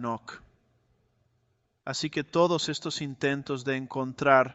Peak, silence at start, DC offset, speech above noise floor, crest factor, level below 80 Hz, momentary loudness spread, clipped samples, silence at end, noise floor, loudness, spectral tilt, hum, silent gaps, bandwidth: -6 dBFS; 0 s; under 0.1%; 45 dB; 22 dB; -66 dBFS; 14 LU; under 0.1%; 0 s; -73 dBFS; -28 LUFS; -4.5 dB/octave; none; none; 8.2 kHz